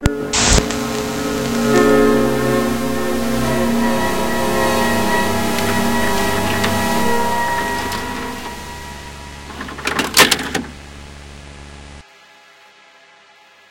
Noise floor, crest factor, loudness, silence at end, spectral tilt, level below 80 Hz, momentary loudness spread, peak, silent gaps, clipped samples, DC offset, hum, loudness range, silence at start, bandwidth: -48 dBFS; 18 dB; -17 LUFS; 0 s; -3.5 dB/octave; -32 dBFS; 20 LU; 0 dBFS; none; under 0.1%; under 0.1%; none; 4 LU; 0 s; 17 kHz